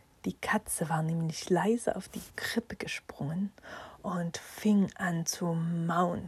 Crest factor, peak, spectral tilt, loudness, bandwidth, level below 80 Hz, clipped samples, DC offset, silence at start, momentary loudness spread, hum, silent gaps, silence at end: 18 dB; -14 dBFS; -5 dB/octave; -32 LUFS; 14.5 kHz; -62 dBFS; under 0.1%; under 0.1%; 0.25 s; 11 LU; none; none; 0 s